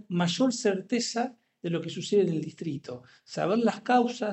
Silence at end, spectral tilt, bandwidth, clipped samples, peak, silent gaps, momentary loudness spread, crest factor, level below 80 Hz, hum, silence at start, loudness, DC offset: 0 s; -5 dB/octave; 8.4 kHz; under 0.1%; -10 dBFS; none; 14 LU; 18 dB; -76 dBFS; none; 0.1 s; -28 LUFS; under 0.1%